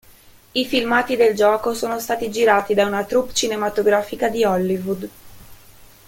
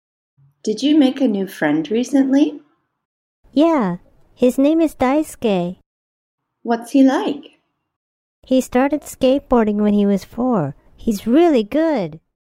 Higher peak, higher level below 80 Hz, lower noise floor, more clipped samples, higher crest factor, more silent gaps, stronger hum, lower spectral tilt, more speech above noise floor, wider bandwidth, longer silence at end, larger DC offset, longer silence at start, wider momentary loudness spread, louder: about the same, -2 dBFS vs -2 dBFS; second, -52 dBFS vs -46 dBFS; second, -48 dBFS vs under -90 dBFS; neither; about the same, 18 dB vs 16 dB; second, none vs 3.05-3.43 s, 5.86-6.38 s, 7.96-8.42 s; neither; second, -4 dB/octave vs -6 dB/octave; second, 29 dB vs over 74 dB; about the same, 17 kHz vs 16 kHz; about the same, 0.2 s vs 0.25 s; neither; about the same, 0.55 s vs 0.65 s; about the same, 8 LU vs 10 LU; about the same, -19 LUFS vs -17 LUFS